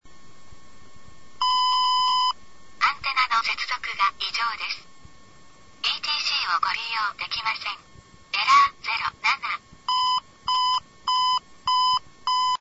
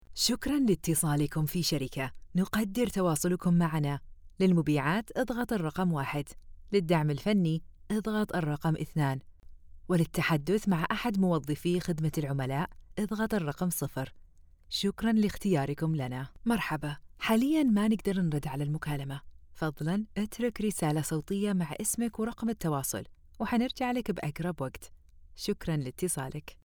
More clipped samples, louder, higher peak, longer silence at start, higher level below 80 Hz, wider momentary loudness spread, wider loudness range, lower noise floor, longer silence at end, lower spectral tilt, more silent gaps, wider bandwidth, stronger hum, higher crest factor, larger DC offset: neither; first, -23 LUFS vs -31 LUFS; first, -6 dBFS vs -12 dBFS; about the same, 0.05 s vs 0.1 s; second, -60 dBFS vs -52 dBFS; about the same, 8 LU vs 9 LU; about the same, 3 LU vs 4 LU; about the same, -52 dBFS vs -55 dBFS; about the same, 0.05 s vs 0.15 s; second, 0.5 dB/octave vs -5.5 dB/octave; neither; second, 8 kHz vs over 20 kHz; neither; about the same, 18 dB vs 18 dB; neither